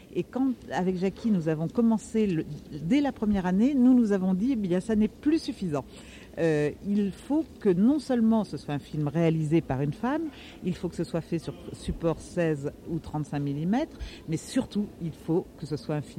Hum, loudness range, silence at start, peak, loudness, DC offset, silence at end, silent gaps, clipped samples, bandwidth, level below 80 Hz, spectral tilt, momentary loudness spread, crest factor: none; 6 LU; 0.05 s; -12 dBFS; -28 LUFS; under 0.1%; 0 s; none; under 0.1%; 13 kHz; -50 dBFS; -7.5 dB/octave; 11 LU; 16 dB